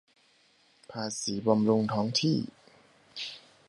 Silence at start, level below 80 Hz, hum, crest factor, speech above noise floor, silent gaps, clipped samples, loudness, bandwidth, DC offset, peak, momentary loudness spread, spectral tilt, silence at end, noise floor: 0.9 s; -68 dBFS; none; 22 dB; 37 dB; none; under 0.1%; -29 LUFS; 11.5 kHz; under 0.1%; -10 dBFS; 17 LU; -5 dB/octave; 0.3 s; -65 dBFS